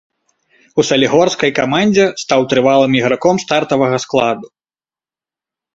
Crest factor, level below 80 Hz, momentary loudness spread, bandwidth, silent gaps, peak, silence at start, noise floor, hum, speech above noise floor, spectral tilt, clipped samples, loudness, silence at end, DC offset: 14 dB; -54 dBFS; 5 LU; 8 kHz; none; 0 dBFS; 0.75 s; under -90 dBFS; none; over 77 dB; -4.5 dB/octave; under 0.1%; -13 LUFS; 1.3 s; under 0.1%